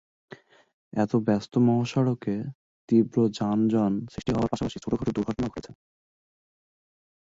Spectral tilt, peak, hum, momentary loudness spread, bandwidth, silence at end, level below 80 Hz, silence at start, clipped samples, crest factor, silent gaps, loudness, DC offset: -8 dB/octave; -10 dBFS; none; 9 LU; 7.8 kHz; 1.5 s; -54 dBFS; 0.95 s; under 0.1%; 18 dB; 2.55-2.88 s; -26 LUFS; under 0.1%